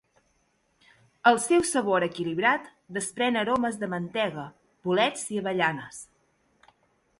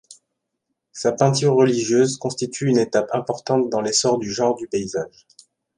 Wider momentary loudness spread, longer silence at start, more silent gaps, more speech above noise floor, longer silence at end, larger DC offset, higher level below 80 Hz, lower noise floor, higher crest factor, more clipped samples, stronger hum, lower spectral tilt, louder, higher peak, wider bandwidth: first, 14 LU vs 9 LU; first, 1.25 s vs 0.1 s; neither; second, 44 dB vs 58 dB; first, 1.15 s vs 0.7 s; neither; about the same, -66 dBFS vs -62 dBFS; second, -70 dBFS vs -78 dBFS; about the same, 22 dB vs 18 dB; neither; neither; second, -3.5 dB/octave vs -5 dB/octave; second, -26 LUFS vs -20 LUFS; second, -6 dBFS vs -2 dBFS; about the same, 11.5 kHz vs 11.5 kHz